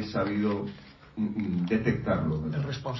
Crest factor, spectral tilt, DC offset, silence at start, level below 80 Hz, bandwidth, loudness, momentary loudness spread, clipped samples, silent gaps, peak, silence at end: 16 dB; -8 dB/octave; under 0.1%; 0 s; -50 dBFS; 6 kHz; -29 LUFS; 10 LU; under 0.1%; none; -12 dBFS; 0 s